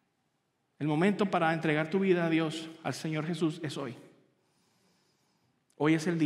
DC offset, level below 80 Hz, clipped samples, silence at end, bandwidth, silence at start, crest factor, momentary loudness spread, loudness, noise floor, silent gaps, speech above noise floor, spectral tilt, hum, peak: under 0.1%; -80 dBFS; under 0.1%; 0 s; 12.5 kHz; 0.8 s; 18 dB; 10 LU; -30 LUFS; -77 dBFS; none; 48 dB; -6.5 dB/octave; none; -14 dBFS